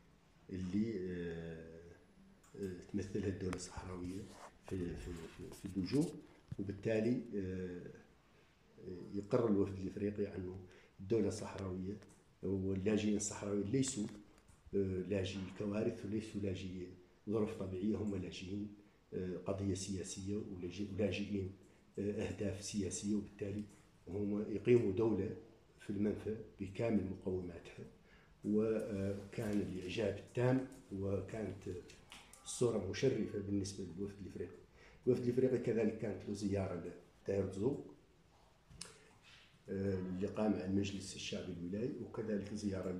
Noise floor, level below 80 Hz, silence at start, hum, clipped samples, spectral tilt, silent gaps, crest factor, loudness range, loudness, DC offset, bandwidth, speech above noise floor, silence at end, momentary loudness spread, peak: -69 dBFS; -66 dBFS; 0.5 s; none; under 0.1%; -6 dB/octave; none; 22 dB; 5 LU; -40 LUFS; under 0.1%; 13 kHz; 29 dB; 0 s; 16 LU; -18 dBFS